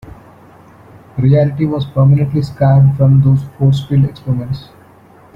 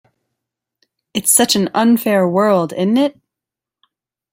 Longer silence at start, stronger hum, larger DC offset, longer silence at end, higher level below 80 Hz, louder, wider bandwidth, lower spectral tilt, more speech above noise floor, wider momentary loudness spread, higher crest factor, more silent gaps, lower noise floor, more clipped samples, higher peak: second, 0.05 s vs 1.15 s; neither; neither; second, 0.7 s vs 1.25 s; first, -40 dBFS vs -62 dBFS; about the same, -13 LUFS vs -14 LUFS; second, 5.4 kHz vs 17 kHz; first, -10 dB/octave vs -3.5 dB/octave; second, 31 dB vs 72 dB; first, 10 LU vs 7 LU; second, 12 dB vs 18 dB; neither; second, -43 dBFS vs -86 dBFS; neither; about the same, -2 dBFS vs 0 dBFS